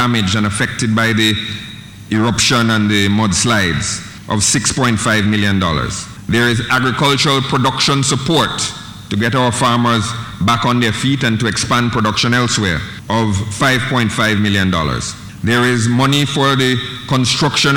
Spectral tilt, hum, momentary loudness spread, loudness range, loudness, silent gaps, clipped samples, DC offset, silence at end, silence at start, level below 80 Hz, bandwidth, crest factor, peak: -4 dB/octave; none; 8 LU; 1 LU; -14 LUFS; none; under 0.1%; under 0.1%; 0 s; 0 s; -38 dBFS; 17.5 kHz; 14 dB; -2 dBFS